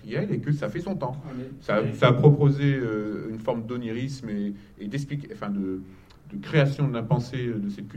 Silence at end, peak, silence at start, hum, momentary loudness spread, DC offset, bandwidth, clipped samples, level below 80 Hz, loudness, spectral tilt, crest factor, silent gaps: 0 s; -2 dBFS; 0 s; none; 14 LU; under 0.1%; 8.6 kHz; under 0.1%; -54 dBFS; -26 LUFS; -8 dB/octave; 22 dB; none